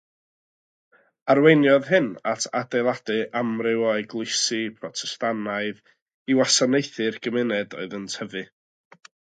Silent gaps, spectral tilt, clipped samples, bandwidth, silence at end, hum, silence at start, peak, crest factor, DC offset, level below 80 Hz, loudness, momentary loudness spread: 6.02-6.06 s, 6.14-6.26 s; -3.5 dB/octave; under 0.1%; 9.4 kHz; 0.95 s; none; 1.25 s; -2 dBFS; 22 dB; under 0.1%; -74 dBFS; -23 LUFS; 14 LU